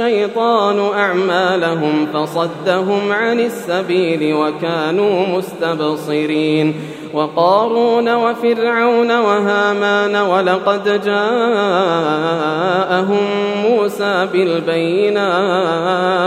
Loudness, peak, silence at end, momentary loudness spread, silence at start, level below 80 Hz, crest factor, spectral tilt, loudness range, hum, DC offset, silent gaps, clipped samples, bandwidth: -15 LUFS; 0 dBFS; 0 s; 5 LU; 0 s; -70 dBFS; 14 dB; -6 dB/octave; 3 LU; none; under 0.1%; none; under 0.1%; 15.5 kHz